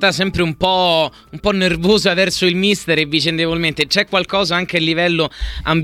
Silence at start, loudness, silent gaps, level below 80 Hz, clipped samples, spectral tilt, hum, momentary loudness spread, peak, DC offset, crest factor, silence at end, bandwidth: 0 s; -16 LUFS; none; -36 dBFS; under 0.1%; -4.5 dB/octave; none; 5 LU; -2 dBFS; under 0.1%; 14 dB; 0 s; 15.5 kHz